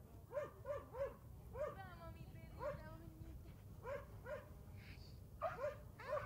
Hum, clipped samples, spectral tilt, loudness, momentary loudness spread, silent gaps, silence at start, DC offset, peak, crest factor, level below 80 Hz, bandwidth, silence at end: none; under 0.1%; -6.5 dB/octave; -51 LUFS; 10 LU; none; 0 s; under 0.1%; -32 dBFS; 18 dB; -62 dBFS; 16 kHz; 0 s